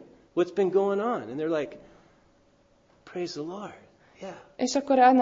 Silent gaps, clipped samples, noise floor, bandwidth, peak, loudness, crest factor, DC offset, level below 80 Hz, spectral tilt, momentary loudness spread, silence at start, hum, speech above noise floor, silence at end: none; under 0.1%; -63 dBFS; 7.8 kHz; -6 dBFS; -27 LUFS; 20 dB; under 0.1%; -70 dBFS; -5 dB/octave; 19 LU; 0 s; none; 37 dB; 0 s